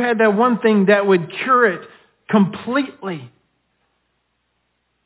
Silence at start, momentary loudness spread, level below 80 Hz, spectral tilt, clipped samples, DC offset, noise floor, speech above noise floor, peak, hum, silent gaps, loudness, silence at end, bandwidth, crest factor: 0 s; 15 LU; -66 dBFS; -10.5 dB/octave; under 0.1%; under 0.1%; -69 dBFS; 53 dB; -2 dBFS; none; none; -16 LUFS; 1.8 s; 4 kHz; 18 dB